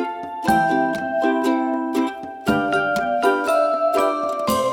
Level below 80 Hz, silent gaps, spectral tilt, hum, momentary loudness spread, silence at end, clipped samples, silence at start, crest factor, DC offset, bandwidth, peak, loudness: -52 dBFS; none; -5 dB/octave; none; 5 LU; 0 s; under 0.1%; 0 s; 16 dB; under 0.1%; 19 kHz; -4 dBFS; -20 LUFS